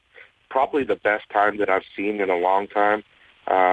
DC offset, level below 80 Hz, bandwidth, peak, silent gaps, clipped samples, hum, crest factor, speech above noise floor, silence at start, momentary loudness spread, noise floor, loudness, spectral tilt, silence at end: under 0.1%; -62 dBFS; 9 kHz; -6 dBFS; none; under 0.1%; none; 16 dB; 30 dB; 0.2 s; 7 LU; -51 dBFS; -22 LUFS; -6.5 dB/octave; 0 s